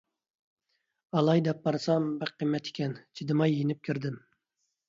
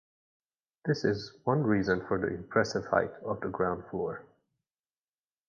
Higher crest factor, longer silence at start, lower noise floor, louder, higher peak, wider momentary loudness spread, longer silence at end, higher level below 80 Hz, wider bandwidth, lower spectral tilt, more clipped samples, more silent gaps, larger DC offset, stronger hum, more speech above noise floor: about the same, 18 dB vs 22 dB; first, 1.15 s vs 0.85 s; second, -81 dBFS vs under -90 dBFS; about the same, -30 LUFS vs -31 LUFS; second, -14 dBFS vs -10 dBFS; about the same, 10 LU vs 8 LU; second, 0.7 s vs 1.25 s; second, -74 dBFS vs -60 dBFS; about the same, 7.6 kHz vs 7.4 kHz; about the same, -7.5 dB/octave vs -6.5 dB/octave; neither; neither; neither; neither; second, 53 dB vs over 60 dB